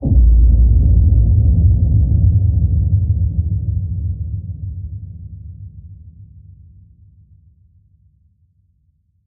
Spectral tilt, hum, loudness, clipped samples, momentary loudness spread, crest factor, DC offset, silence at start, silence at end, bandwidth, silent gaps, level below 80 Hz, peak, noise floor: -17.5 dB/octave; none; -15 LUFS; under 0.1%; 21 LU; 14 dB; under 0.1%; 0 s; 3.15 s; 0.9 kHz; none; -18 dBFS; -2 dBFS; -60 dBFS